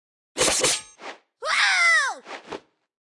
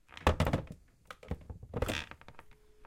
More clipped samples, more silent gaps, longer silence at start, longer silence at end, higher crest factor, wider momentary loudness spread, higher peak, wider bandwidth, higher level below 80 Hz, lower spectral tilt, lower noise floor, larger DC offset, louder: neither; neither; first, 0.35 s vs 0.15 s; first, 0.5 s vs 0 s; second, 18 dB vs 26 dB; about the same, 23 LU vs 22 LU; about the same, -8 dBFS vs -10 dBFS; second, 12 kHz vs 16.5 kHz; second, -56 dBFS vs -44 dBFS; second, 0.5 dB/octave vs -5.5 dB/octave; second, -43 dBFS vs -56 dBFS; neither; first, -20 LUFS vs -36 LUFS